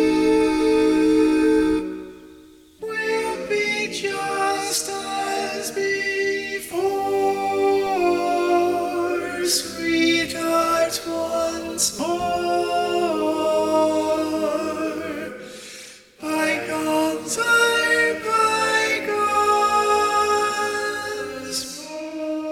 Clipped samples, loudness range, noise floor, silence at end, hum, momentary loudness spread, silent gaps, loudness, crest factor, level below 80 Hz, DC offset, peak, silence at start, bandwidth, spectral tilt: under 0.1%; 5 LU; -47 dBFS; 0 s; none; 10 LU; none; -21 LUFS; 16 dB; -52 dBFS; under 0.1%; -6 dBFS; 0 s; 17 kHz; -2.5 dB/octave